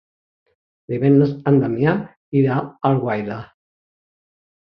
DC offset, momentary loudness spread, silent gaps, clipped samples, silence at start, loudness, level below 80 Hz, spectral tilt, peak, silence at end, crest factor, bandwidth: under 0.1%; 11 LU; 2.16-2.32 s; under 0.1%; 0.9 s; -19 LUFS; -58 dBFS; -11 dB/octave; -2 dBFS; 1.25 s; 18 dB; 5.4 kHz